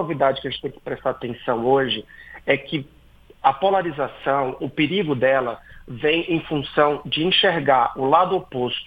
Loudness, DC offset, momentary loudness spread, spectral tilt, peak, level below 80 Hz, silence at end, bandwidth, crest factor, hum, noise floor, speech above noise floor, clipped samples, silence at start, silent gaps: -21 LUFS; under 0.1%; 12 LU; -7.5 dB/octave; -2 dBFS; -52 dBFS; 0 s; 5.2 kHz; 20 dB; none; -41 dBFS; 20 dB; under 0.1%; 0 s; none